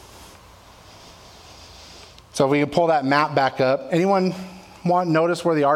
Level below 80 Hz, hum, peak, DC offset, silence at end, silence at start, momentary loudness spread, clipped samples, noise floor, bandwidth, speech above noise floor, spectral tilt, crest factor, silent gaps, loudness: -56 dBFS; none; -4 dBFS; under 0.1%; 0 s; 0.15 s; 21 LU; under 0.1%; -47 dBFS; 16 kHz; 28 dB; -6 dB/octave; 18 dB; none; -20 LUFS